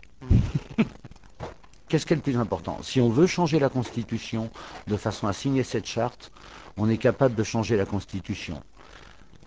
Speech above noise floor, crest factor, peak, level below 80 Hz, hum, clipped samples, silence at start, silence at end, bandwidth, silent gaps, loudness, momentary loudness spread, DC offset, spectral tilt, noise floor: 25 dB; 20 dB; -6 dBFS; -40 dBFS; none; under 0.1%; 0.2 s; 0.1 s; 8 kHz; none; -26 LUFS; 18 LU; under 0.1%; -6.5 dB/octave; -50 dBFS